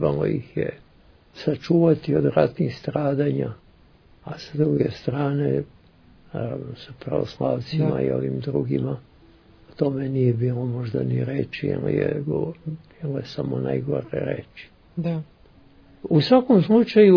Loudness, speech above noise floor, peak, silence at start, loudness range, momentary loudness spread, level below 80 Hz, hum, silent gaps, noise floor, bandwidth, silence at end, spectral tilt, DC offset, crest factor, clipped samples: -23 LUFS; 31 dB; -2 dBFS; 0 s; 4 LU; 17 LU; -54 dBFS; none; none; -53 dBFS; 5.4 kHz; 0 s; -9.5 dB/octave; under 0.1%; 20 dB; under 0.1%